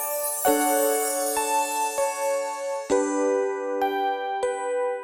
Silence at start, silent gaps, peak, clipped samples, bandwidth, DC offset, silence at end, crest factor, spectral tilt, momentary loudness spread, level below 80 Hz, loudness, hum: 0 s; none; -8 dBFS; under 0.1%; over 20 kHz; under 0.1%; 0 s; 18 dB; -1 dB/octave; 6 LU; -64 dBFS; -24 LUFS; none